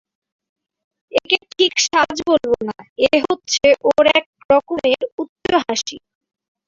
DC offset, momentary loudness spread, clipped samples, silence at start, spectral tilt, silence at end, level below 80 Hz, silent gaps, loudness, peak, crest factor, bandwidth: under 0.1%; 9 LU; under 0.1%; 1.15 s; -2 dB/octave; 0.7 s; -54 dBFS; 2.89-2.96 s, 4.26-4.33 s, 4.45-4.49 s, 5.12-5.18 s, 5.29-5.36 s; -17 LUFS; -2 dBFS; 18 dB; 7.8 kHz